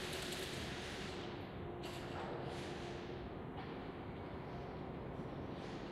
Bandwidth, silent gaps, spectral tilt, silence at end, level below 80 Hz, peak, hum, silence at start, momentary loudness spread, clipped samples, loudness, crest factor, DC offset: 16 kHz; none; -5 dB/octave; 0 s; -60 dBFS; -30 dBFS; none; 0 s; 5 LU; under 0.1%; -46 LUFS; 18 dB; under 0.1%